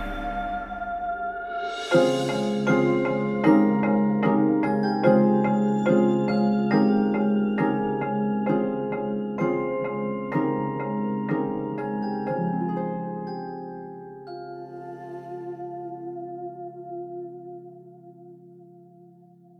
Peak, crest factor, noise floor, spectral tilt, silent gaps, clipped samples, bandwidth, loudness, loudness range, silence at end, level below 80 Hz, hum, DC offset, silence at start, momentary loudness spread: -4 dBFS; 20 dB; -52 dBFS; -7.5 dB/octave; none; under 0.1%; 9.8 kHz; -24 LUFS; 16 LU; 0.55 s; -52 dBFS; none; under 0.1%; 0 s; 17 LU